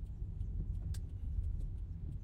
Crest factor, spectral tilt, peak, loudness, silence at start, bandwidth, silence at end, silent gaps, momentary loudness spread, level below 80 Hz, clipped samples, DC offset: 12 dB; -8 dB/octave; -28 dBFS; -44 LUFS; 0 s; 9.8 kHz; 0 s; none; 4 LU; -42 dBFS; under 0.1%; under 0.1%